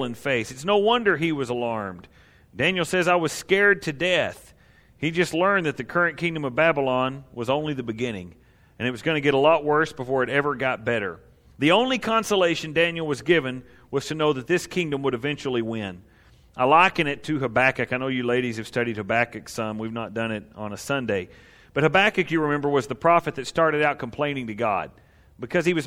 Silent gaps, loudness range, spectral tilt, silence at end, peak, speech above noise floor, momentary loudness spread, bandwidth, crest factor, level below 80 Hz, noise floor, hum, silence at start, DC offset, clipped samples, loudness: none; 3 LU; -5 dB/octave; 0 s; -4 dBFS; 32 dB; 11 LU; 16 kHz; 20 dB; -56 dBFS; -55 dBFS; none; 0 s; under 0.1%; under 0.1%; -23 LUFS